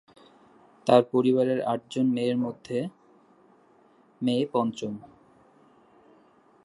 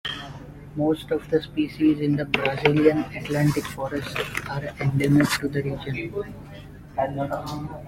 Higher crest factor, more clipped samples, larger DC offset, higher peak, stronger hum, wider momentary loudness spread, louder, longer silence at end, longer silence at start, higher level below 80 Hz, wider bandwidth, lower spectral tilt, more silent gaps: about the same, 24 dB vs 22 dB; neither; neither; about the same, -4 dBFS vs -2 dBFS; neither; about the same, 13 LU vs 14 LU; about the same, -26 LUFS vs -24 LUFS; first, 1.6 s vs 0 s; first, 0.85 s vs 0.05 s; second, -74 dBFS vs -48 dBFS; second, 11 kHz vs 16.5 kHz; about the same, -7 dB/octave vs -6 dB/octave; neither